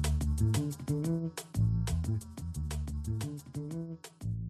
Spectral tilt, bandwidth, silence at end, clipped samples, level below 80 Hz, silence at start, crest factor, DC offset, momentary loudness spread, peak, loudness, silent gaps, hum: -6.5 dB/octave; 13 kHz; 0 s; under 0.1%; -40 dBFS; 0 s; 16 dB; under 0.1%; 10 LU; -18 dBFS; -35 LUFS; none; none